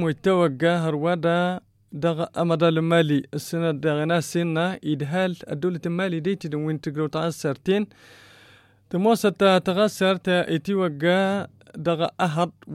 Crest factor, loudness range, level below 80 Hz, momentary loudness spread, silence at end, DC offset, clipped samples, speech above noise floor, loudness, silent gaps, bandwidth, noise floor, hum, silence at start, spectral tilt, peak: 16 dB; 4 LU; -64 dBFS; 8 LU; 0 s; under 0.1%; under 0.1%; 31 dB; -23 LUFS; none; 15 kHz; -54 dBFS; none; 0 s; -6 dB/octave; -8 dBFS